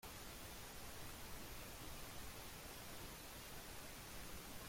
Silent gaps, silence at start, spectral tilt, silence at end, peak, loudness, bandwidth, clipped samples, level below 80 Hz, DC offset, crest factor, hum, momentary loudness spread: none; 0 s; -3 dB/octave; 0 s; -40 dBFS; -53 LUFS; 16.5 kHz; under 0.1%; -60 dBFS; under 0.1%; 14 dB; none; 1 LU